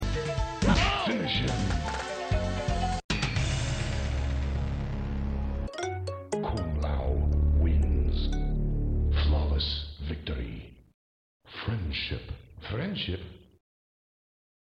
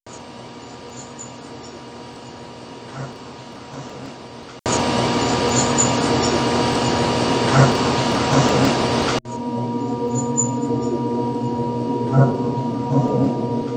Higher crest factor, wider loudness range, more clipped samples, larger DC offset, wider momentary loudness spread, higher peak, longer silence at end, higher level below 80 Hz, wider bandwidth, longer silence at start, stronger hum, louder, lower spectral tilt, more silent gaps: about the same, 18 dB vs 20 dB; second, 8 LU vs 18 LU; neither; neither; second, 10 LU vs 20 LU; second, -10 dBFS vs 0 dBFS; first, 1.3 s vs 0 s; first, -32 dBFS vs -46 dBFS; about the same, 9.2 kHz vs 10 kHz; about the same, 0 s vs 0.05 s; neither; second, -30 LUFS vs -19 LUFS; about the same, -5.5 dB/octave vs -5 dB/octave; first, 3.04-3.09 s, 10.94-11.40 s vs none